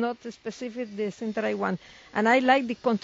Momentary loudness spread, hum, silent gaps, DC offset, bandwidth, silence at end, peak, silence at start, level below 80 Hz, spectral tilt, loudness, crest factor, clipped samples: 15 LU; none; none; under 0.1%; 7.8 kHz; 0.05 s; -8 dBFS; 0 s; -68 dBFS; -3.5 dB/octave; -27 LUFS; 18 dB; under 0.1%